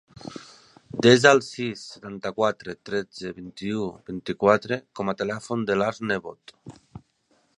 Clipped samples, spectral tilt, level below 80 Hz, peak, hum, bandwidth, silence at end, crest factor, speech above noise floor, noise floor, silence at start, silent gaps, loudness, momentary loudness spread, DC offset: under 0.1%; -5 dB/octave; -60 dBFS; -2 dBFS; none; 11 kHz; 0.6 s; 24 dB; 42 dB; -67 dBFS; 0.25 s; none; -24 LUFS; 20 LU; under 0.1%